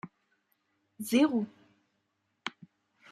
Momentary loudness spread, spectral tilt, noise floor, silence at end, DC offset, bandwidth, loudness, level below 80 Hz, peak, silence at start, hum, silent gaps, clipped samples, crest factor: 17 LU; -4.5 dB/octave; -79 dBFS; 0.6 s; under 0.1%; 13.5 kHz; -31 LUFS; -80 dBFS; -14 dBFS; 0.05 s; none; none; under 0.1%; 20 dB